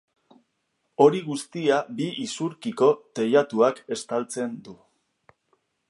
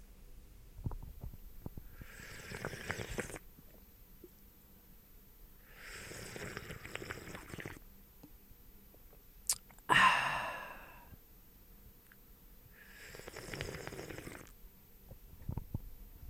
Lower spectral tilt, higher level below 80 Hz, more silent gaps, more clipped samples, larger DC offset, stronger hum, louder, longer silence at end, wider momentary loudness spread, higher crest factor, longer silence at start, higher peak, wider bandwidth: first, -5 dB/octave vs -2.5 dB/octave; second, -76 dBFS vs -56 dBFS; neither; neither; neither; neither; first, -24 LUFS vs -38 LUFS; first, 1.15 s vs 0 s; second, 12 LU vs 23 LU; second, 22 dB vs 30 dB; first, 1 s vs 0 s; first, -4 dBFS vs -12 dBFS; second, 11.5 kHz vs 16.5 kHz